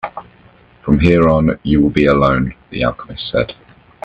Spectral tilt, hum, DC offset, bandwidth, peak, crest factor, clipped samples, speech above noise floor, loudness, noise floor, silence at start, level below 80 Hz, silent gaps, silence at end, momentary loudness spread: -8.5 dB/octave; none; under 0.1%; 8.2 kHz; 0 dBFS; 16 dB; under 0.1%; 33 dB; -14 LUFS; -46 dBFS; 0.05 s; -32 dBFS; none; 0.55 s; 15 LU